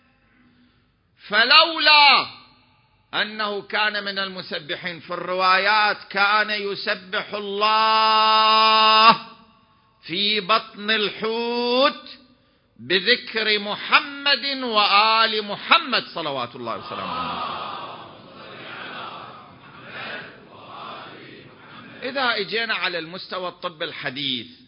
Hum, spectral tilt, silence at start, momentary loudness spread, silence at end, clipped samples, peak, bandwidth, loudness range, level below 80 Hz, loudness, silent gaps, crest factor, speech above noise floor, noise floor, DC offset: none; -6 dB/octave; 1.25 s; 20 LU; 0.2 s; under 0.1%; 0 dBFS; 5.4 kHz; 15 LU; -66 dBFS; -19 LUFS; none; 22 dB; 42 dB; -62 dBFS; under 0.1%